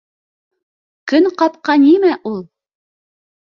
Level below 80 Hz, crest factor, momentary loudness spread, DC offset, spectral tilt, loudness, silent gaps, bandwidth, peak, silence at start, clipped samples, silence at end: -66 dBFS; 14 dB; 16 LU; under 0.1%; -6 dB/octave; -13 LUFS; none; 6.8 kHz; -2 dBFS; 1.05 s; under 0.1%; 1 s